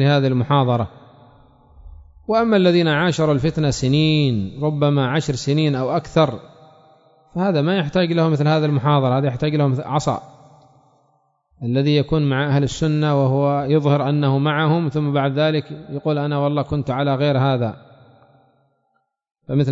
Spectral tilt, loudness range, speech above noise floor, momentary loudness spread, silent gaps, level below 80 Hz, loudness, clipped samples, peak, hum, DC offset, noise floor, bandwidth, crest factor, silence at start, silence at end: -7 dB/octave; 4 LU; 52 dB; 6 LU; none; -46 dBFS; -19 LUFS; under 0.1%; -2 dBFS; none; under 0.1%; -69 dBFS; 7.8 kHz; 16 dB; 0 s; 0 s